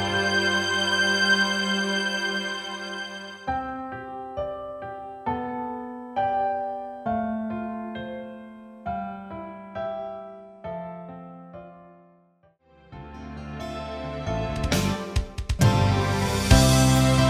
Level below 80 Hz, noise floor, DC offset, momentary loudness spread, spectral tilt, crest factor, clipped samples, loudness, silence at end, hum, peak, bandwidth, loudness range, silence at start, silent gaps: -36 dBFS; -61 dBFS; under 0.1%; 20 LU; -4.5 dB/octave; 24 dB; under 0.1%; -25 LUFS; 0 s; none; -2 dBFS; 16 kHz; 15 LU; 0 s; none